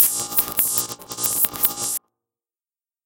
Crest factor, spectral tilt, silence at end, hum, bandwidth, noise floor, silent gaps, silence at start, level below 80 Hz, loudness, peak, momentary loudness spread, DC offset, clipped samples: 24 dB; -0.5 dB/octave; 1.05 s; none; 19 kHz; under -90 dBFS; none; 0 s; -58 dBFS; -20 LUFS; 0 dBFS; 8 LU; under 0.1%; under 0.1%